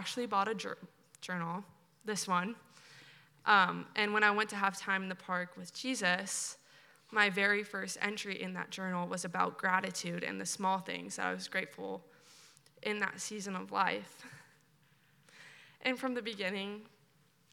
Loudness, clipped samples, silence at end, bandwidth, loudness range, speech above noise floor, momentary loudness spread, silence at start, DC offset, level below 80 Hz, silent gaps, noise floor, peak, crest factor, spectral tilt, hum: -35 LUFS; under 0.1%; 0.65 s; 17.5 kHz; 7 LU; 34 dB; 17 LU; 0 s; under 0.1%; under -90 dBFS; none; -69 dBFS; -12 dBFS; 24 dB; -3 dB/octave; none